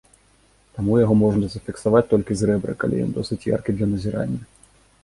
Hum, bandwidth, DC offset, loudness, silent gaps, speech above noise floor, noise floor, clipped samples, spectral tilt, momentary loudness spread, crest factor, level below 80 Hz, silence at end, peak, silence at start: none; 11.5 kHz; under 0.1%; -21 LUFS; none; 37 dB; -58 dBFS; under 0.1%; -7.5 dB/octave; 10 LU; 18 dB; -44 dBFS; 0.6 s; -4 dBFS; 0.75 s